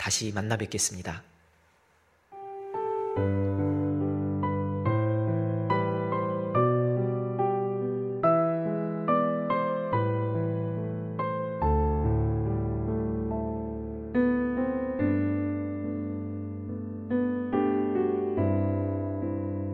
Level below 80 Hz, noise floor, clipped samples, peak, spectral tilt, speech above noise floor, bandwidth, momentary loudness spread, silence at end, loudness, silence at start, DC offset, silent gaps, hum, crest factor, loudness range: -42 dBFS; -65 dBFS; under 0.1%; -10 dBFS; -6 dB/octave; 35 dB; 14 kHz; 8 LU; 0 s; -29 LUFS; 0 s; under 0.1%; none; none; 18 dB; 3 LU